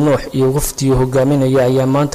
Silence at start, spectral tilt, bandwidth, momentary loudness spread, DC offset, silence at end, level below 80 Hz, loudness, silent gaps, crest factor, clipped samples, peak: 0 s; -6.5 dB/octave; 16 kHz; 3 LU; under 0.1%; 0 s; -30 dBFS; -14 LUFS; none; 8 dB; under 0.1%; -6 dBFS